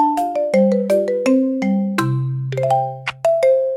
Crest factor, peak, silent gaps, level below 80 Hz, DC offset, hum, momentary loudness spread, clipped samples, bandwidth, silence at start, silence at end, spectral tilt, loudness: 14 dB; -4 dBFS; none; -60 dBFS; under 0.1%; none; 6 LU; under 0.1%; 16 kHz; 0 s; 0 s; -7.5 dB/octave; -18 LUFS